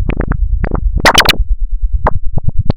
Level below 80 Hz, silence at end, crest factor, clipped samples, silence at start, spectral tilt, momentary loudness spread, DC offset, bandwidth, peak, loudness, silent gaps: -14 dBFS; 0 s; 12 dB; 0.5%; 0 s; -3.5 dB/octave; 13 LU; under 0.1%; 17.5 kHz; 0 dBFS; -13 LUFS; none